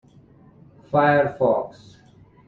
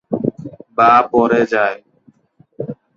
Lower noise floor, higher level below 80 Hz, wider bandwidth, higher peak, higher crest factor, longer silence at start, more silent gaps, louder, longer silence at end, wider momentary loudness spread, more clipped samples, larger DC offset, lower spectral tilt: about the same, -52 dBFS vs -53 dBFS; about the same, -60 dBFS vs -56 dBFS; about the same, 7 kHz vs 7.2 kHz; second, -6 dBFS vs 0 dBFS; about the same, 18 dB vs 16 dB; first, 0.9 s vs 0.1 s; neither; second, -20 LUFS vs -15 LUFS; first, 0.8 s vs 0.25 s; second, 8 LU vs 19 LU; neither; neither; first, -8.5 dB/octave vs -7 dB/octave